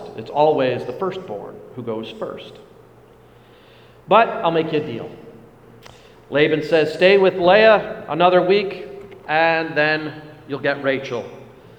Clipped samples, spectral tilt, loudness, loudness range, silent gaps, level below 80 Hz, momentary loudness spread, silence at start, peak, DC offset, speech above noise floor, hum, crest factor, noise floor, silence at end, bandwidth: under 0.1%; -6.5 dB/octave; -18 LUFS; 8 LU; none; -58 dBFS; 19 LU; 0 s; 0 dBFS; under 0.1%; 30 dB; none; 20 dB; -48 dBFS; 0.35 s; 9.2 kHz